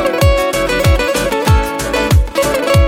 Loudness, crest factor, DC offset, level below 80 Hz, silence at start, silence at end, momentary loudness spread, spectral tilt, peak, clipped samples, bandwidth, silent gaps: -13 LUFS; 12 dB; under 0.1%; -18 dBFS; 0 s; 0 s; 3 LU; -5 dB/octave; 0 dBFS; under 0.1%; 17 kHz; none